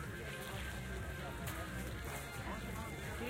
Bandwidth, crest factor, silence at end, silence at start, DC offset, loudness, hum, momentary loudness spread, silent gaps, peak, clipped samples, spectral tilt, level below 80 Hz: 16.5 kHz; 14 dB; 0 s; 0 s; under 0.1%; -44 LUFS; none; 1 LU; none; -30 dBFS; under 0.1%; -4.5 dB/octave; -50 dBFS